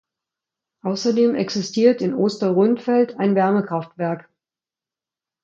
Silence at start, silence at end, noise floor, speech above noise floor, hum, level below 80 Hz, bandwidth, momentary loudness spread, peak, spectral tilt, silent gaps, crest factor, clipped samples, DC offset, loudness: 0.85 s; 1.2 s; under -90 dBFS; over 71 dB; none; -70 dBFS; 7.6 kHz; 9 LU; -4 dBFS; -6.5 dB/octave; none; 18 dB; under 0.1%; under 0.1%; -20 LUFS